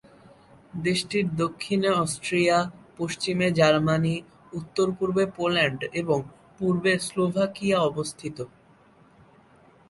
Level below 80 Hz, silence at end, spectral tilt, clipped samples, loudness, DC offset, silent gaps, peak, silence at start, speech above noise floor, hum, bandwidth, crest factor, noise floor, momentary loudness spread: -60 dBFS; 1.4 s; -5 dB/octave; under 0.1%; -25 LUFS; under 0.1%; none; -8 dBFS; 0.75 s; 32 dB; none; 11.5 kHz; 18 dB; -56 dBFS; 12 LU